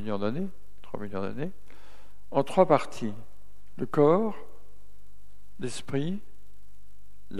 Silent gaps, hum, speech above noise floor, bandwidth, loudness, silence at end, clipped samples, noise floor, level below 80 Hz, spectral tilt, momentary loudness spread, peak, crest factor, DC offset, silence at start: none; none; 31 dB; 14.5 kHz; -29 LUFS; 0 s; under 0.1%; -58 dBFS; -58 dBFS; -7 dB/octave; 17 LU; -6 dBFS; 24 dB; 3%; 0 s